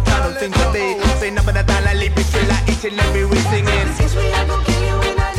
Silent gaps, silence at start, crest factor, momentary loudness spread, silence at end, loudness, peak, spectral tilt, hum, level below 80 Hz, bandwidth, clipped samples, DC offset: none; 0 s; 12 dB; 2 LU; 0 s; -17 LUFS; -4 dBFS; -5 dB/octave; none; -20 dBFS; 15 kHz; under 0.1%; under 0.1%